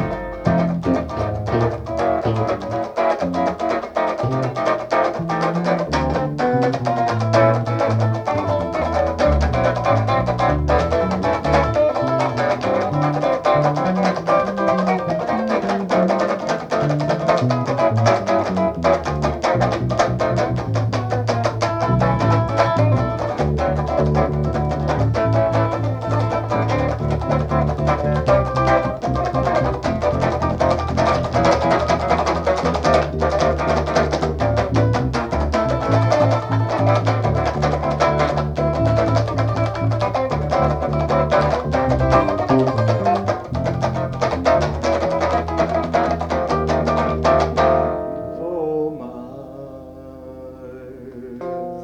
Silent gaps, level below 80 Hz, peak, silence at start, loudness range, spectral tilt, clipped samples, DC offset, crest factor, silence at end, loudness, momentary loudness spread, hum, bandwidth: none; -32 dBFS; -2 dBFS; 0 s; 2 LU; -7 dB/octave; under 0.1%; under 0.1%; 16 dB; 0 s; -19 LUFS; 5 LU; none; 9.2 kHz